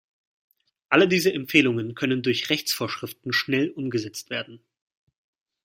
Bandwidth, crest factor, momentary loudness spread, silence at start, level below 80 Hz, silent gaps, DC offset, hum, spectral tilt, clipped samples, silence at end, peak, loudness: 16.5 kHz; 24 dB; 12 LU; 0.9 s; -68 dBFS; none; under 0.1%; none; -4.5 dB/octave; under 0.1%; 1.05 s; -2 dBFS; -23 LUFS